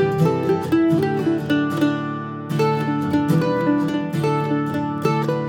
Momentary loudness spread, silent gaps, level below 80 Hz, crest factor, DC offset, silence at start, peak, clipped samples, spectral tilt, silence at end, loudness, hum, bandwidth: 4 LU; none; -58 dBFS; 14 dB; under 0.1%; 0 s; -4 dBFS; under 0.1%; -7.5 dB/octave; 0 s; -20 LUFS; none; 17.5 kHz